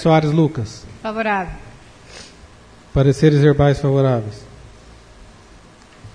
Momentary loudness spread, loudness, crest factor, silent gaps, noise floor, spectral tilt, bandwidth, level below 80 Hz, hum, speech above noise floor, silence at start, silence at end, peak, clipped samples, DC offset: 25 LU; -17 LUFS; 16 dB; none; -45 dBFS; -7.5 dB/octave; 10 kHz; -40 dBFS; none; 29 dB; 0 s; 0.05 s; -2 dBFS; under 0.1%; under 0.1%